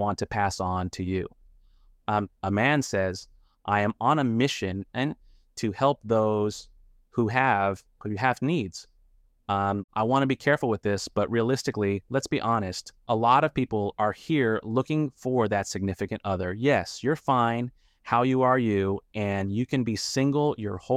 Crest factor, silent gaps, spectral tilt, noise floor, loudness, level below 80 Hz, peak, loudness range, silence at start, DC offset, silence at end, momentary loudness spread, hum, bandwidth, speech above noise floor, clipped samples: 18 dB; 9.84-9.88 s; -6 dB/octave; -61 dBFS; -26 LUFS; -56 dBFS; -8 dBFS; 2 LU; 0 s; under 0.1%; 0 s; 9 LU; none; 15 kHz; 35 dB; under 0.1%